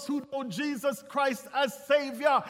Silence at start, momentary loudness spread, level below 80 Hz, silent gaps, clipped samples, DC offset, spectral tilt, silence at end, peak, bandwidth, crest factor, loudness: 0 s; 7 LU; -78 dBFS; none; under 0.1%; under 0.1%; -4 dB/octave; 0 s; -10 dBFS; 16.5 kHz; 18 dB; -30 LUFS